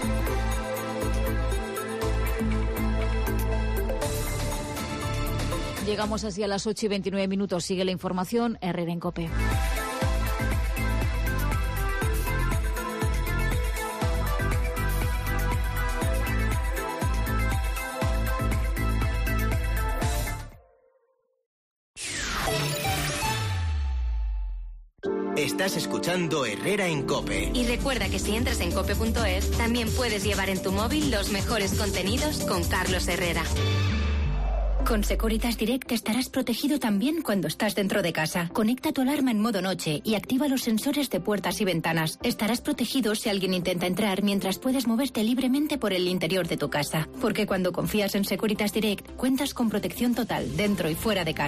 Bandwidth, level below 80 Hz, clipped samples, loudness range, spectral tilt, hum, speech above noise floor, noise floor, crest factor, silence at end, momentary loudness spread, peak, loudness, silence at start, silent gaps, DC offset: 15.5 kHz; -32 dBFS; under 0.1%; 3 LU; -5 dB/octave; none; 44 dB; -70 dBFS; 12 dB; 0 s; 4 LU; -14 dBFS; -27 LUFS; 0 s; 21.46-21.94 s; under 0.1%